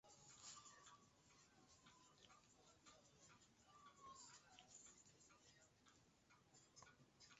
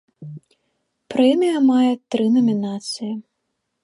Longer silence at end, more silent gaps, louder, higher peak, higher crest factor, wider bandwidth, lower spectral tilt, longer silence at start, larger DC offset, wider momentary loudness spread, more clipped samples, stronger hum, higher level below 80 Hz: second, 0 s vs 0.6 s; neither; second, -65 LUFS vs -19 LUFS; second, -48 dBFS vs -4 dBFS; first, 22 dB vs 16 dB; second, 8 kHz vs 11 kHz; second, -2 dB/octave vs -6 dB/octave; second, 0.05 s vs 0.2 s; neither; second, 9 LU vs 19 LU; neither; neither; second, -88 dBFS vs -72 dBFS